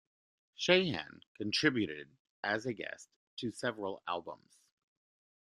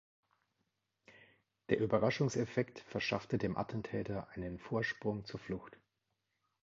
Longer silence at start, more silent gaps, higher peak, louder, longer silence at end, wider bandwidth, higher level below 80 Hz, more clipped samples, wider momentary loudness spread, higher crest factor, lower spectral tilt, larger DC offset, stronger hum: second, 0.6 s vs 1.1 s; first, 1.27-1.35 s, 2.20-2.43 s, 3.16-3.37 s vs none; first, -12 dBFS vs -16 dBFS; first, -35 LUFS vs -38 LUFS; first, 1.05 s vs 0.9 s; first, 12 kHz vs 7.4 kHz; second, -76 dBFS vs -64 dBFS; neither; first, 21 LU vs 12 LU; about the same, 26 dB vs 24 dB; about the same, -4.5 dB/octave vs -5.5 dB/octave; neither; neither